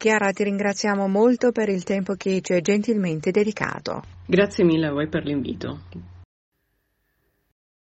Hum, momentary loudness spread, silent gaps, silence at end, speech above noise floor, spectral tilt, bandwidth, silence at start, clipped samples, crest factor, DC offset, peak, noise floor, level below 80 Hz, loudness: none; 13 LU; none; 1.7 s; 50 dB; -6 dB/octave; 8.6 kHz; 0 s; under 0.1%; 20 dB; under 0.1%; -4 dBFS; -72 dBFS; -58 dBFS; -22 LUFS